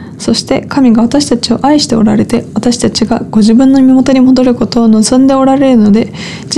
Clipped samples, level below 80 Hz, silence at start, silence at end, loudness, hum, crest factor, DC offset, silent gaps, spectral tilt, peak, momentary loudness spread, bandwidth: under 0.1%; -36 dBFS; 0 s; 0 s; -8 LUFS; none; 8 dB; under 0.1%; none; -5 dB/octave; 0 dBFS; 7 LU; 11.5 kHz